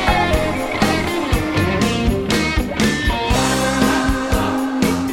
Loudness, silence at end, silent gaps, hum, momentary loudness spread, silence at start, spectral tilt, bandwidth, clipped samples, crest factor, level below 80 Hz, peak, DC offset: -18 LUFS; 0 s; none; none; 3 LU; 0 s; -4.5 dB/octave; 16.5 kHz; under 0.1%; 16 dB; -26 dBFS; -2 dBFS; under 0.1%